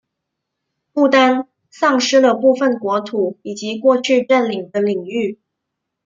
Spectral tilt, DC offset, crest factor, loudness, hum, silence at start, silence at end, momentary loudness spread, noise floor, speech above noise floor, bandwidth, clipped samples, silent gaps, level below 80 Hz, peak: -4 dB/octave; under 0.1%; 16 dB; -16 LUFS; none; 0.95 s; 0.7 s; 11 LU; -78 dBFS; 63 dB; 7.6 kHz; under 0.1%; none; -68 dBFS; -2 dBFS